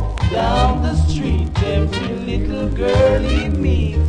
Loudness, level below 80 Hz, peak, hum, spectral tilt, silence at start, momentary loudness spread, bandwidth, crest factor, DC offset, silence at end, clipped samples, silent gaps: -18 LUFS; -20 dBFS; -2 dBFS; none; -7 dB/octave; 0 s; 7 LU; 9.8 kHz; 14 dB; 0.3%; 0 s; under 0.1%; none